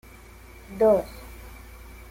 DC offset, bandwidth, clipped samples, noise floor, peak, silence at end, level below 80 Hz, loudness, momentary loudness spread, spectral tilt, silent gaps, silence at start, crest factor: under 0.1%; 16.5 kHz; under 0.1%; -47 dBFS; -10 dBFS; 0.55 s; -46 dBFS; -22 LUFS; 25 LU; -6.5 dB/octave; none; 0.7 s; 18 dB